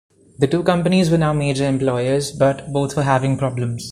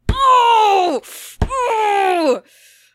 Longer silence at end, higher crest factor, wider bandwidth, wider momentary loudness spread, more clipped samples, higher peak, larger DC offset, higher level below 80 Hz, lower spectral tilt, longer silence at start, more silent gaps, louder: second, 0 s vs 0.55 s; about the same, 16 dB vs 14 dB; second, 14 kHz vs 16 kHz; second, 6 LU vs 13 LU; neither; about the same, -2 dBFS vs -2 dBFS; neither; second, -46 dBFS vs -30 dBFS; first, -6.5 dB/octave vs -4.5 dB/octave; first, 0.4 s vs 0.05 s; neither; second, -18 LUFS vs -15 LUFS